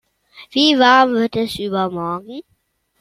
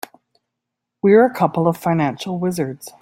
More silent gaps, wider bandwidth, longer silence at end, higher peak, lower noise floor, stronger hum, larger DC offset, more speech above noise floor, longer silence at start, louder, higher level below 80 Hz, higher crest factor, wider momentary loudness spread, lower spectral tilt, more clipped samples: neither; about the same, 15 kHz vs 16.5 kHz; first, 0.6 s vs 0.15 s; about the same, 0 dBFS vs -2 dBFS; second, -65 dBFS vs -80 dBFS; neither; neither; second, 49 dB vs 63 dB; second, 0.35 s vs 1.05 s; about the same, -16 LUFS vs -18 LUFS; first, -54 dBFS vs -60 dBFS; about the same, 18 dB vs 16 dB; first, 17 LU vs 12 LU; second, -4.5 dB/octave vs -7 dB/octave; neither